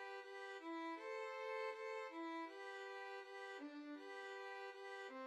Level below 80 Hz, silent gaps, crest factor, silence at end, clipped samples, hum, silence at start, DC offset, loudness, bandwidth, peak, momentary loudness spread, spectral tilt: under -90 dBFS; none; 14 dB; 0 s; under 0.1%; none; 0 s; under 0.1%; -50 LUFS; 13 kHz; -36 dBFS; 5 LU; -1 dB/octave